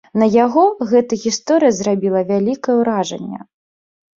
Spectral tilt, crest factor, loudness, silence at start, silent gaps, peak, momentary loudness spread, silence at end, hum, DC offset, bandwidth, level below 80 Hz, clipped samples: -5.5 dB/octave; 14 dB; -16 LUFS; 0.15 s; none; -2 dBFS; 10 LU; 0.8 s; none; under 0.1%; 7.6 kHz; -60 dBFS; under 0.1%